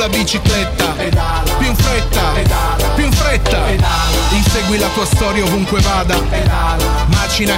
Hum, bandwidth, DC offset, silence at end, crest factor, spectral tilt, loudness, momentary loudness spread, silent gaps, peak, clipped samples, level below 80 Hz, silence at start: none; 16.5 kHz; under 0.1%; 0 s; 12 dB; -4.5 dB/octave; -14 LUFS; 2 LU; none; 0 dBFS; under 0.1%; -18 dBFS; 0 s